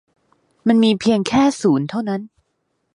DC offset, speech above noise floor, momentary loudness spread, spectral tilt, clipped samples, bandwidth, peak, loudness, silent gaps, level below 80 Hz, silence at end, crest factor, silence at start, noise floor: under 0.1%; 54 dB; 9 LU; -5.5 dB/octave; under 0.1%; 11 kHz; -2 dBFS; -18 LUFS; none; -56 dBFS; 0.7 s; 16 dB; 0.65 s; -70 dBFS